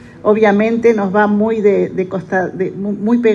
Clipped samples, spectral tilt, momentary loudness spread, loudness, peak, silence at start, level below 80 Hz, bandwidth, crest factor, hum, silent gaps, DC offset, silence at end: under 0.1%; -8 dB/octave; 8 LU; -14 LUFS; 0 dBFS; 0.05 s; -52 dBFS; 7.4 kHz; 14 dB; none; none; under 0.1%; 0 s